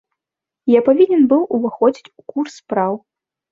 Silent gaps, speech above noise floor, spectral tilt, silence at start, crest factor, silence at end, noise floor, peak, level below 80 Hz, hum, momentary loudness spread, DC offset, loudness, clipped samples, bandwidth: none; 71 dB; -7 dB/octave; 0.65 s; 16 dB; 0.55 s; -86 dBFS; -2 dBFS; -62 dBFS; none; 14 LU; under 0.1%; -16 LUFS; under 0.1%; 7.6 kHz